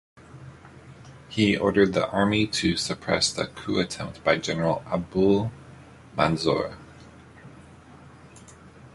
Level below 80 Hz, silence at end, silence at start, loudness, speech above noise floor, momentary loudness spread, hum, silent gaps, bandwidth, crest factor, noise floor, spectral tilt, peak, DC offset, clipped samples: -50 dBFS; 0.05 s; 0.35 s; -24 LUFS; 24 dB; 13 LU; none; none; 11.5 kHz; 22 dB; -48 dBFS; -4.5 dB/octave; -4 dBFS; under 0.1%; under 0.1%